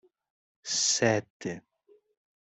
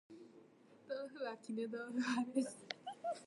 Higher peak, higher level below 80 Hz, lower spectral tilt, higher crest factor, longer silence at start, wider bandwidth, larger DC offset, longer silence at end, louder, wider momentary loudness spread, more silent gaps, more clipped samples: first, -10 dBFS vs -22 dBFS; first, -70 dBFS vs under -90 dBFS; second, -2.5 dB/octave vs -4 dB/octave; about the same, 22 dB vs 22 dB; first, 0.65 s vs 0.1 s; second, 8.4 kHz vs 11.5 kHz; neither; first, 0.8 s vs 0 s; first, -28 LUFS vs -43 LUFS; first, 19 LU vs 15 LU; first, 1.30-1.40 s vs none; neither